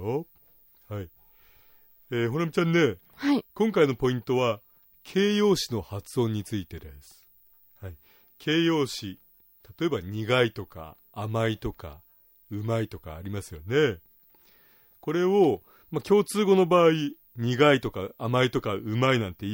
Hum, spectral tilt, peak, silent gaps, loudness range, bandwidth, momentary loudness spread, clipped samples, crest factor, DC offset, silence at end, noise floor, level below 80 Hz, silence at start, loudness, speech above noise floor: none; -6 dB/octave; -8 dBFS; none; 8 LU; 16.5 kHz; 18 LU; under 0.1%; 18 dB; under 0.1%; 0 s; -59 dBFS; -56 dBFS; 0 s; -26 LUFS; 34 dB